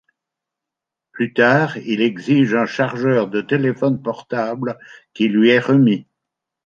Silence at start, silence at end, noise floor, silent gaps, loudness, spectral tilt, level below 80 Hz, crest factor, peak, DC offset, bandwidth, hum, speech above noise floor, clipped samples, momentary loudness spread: 1.15 s; 0.65 s; -85 dBFS; none; -17 LUFS; -7.5 dB/octave; -64 dBFS; 16 dB; -2 dBFS; under 0.1%; 7.2 kHz; none; 68 dB; under 0.1%; 10 LU